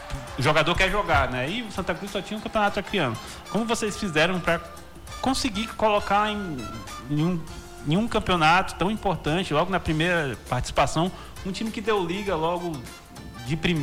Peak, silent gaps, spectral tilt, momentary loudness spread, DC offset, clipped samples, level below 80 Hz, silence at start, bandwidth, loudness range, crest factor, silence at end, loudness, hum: -8 dBFS; none; -5 dB/octave; 14 LU; under 0.1%; under 0.1%; -40 dBFS; 0 s; 19 kHz; 3 LU; 16 dB; 0 s; -25 LUFS; none